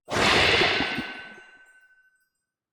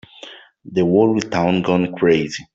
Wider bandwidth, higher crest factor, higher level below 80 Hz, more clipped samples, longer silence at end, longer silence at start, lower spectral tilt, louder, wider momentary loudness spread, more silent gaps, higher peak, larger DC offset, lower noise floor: first, 19 kHz vs 7.8 kHz; about the same, 18 dB vs 14 dB; first, -48 dBFS vs -54 dBFS; neither; first, 1.35 s vs 0.1 s; second, 0.1 s vs 0.25 s; second, -3 dB/octave vs -6.5 dB/octave; second, -21 LUFS vs -17 LUFS; about the same, 21 LU vs 22 LU; neither; second, -8 dBFS vs -4 dBFS; neither; first, -78 dBFS vs -41 dBFS